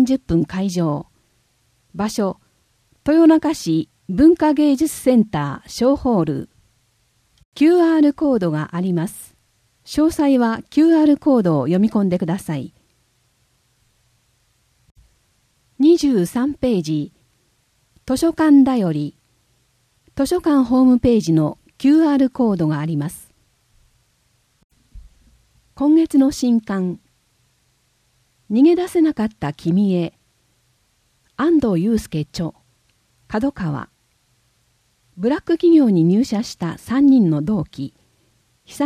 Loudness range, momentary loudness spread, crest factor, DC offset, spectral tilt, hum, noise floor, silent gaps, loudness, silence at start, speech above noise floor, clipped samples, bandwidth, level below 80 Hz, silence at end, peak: 6 LU; 14 LU; 16 dB; under 0.1%; -7 dB/octave; none; -63 dBFS; 7.45-7.52 s, 14.91-14.95 s, 24.64-24.70 s; -17 LUFS; 0 s; 47 dB; under 0.1%; 14.5 kHz; -48 dBFS; 0 s; -2 dBFS